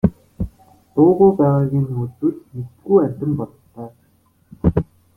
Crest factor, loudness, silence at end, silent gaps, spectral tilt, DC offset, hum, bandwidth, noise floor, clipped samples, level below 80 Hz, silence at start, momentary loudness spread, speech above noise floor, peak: 16 dB; -18 LUFS; 0.35 s; none; -12 dB/octave; under 0.1%; none; 2.8 kHz; -58 dBFS; under 0.1%; -40 dBFS; 0.05 s; 20 LU; 41 dB; -2 dBFS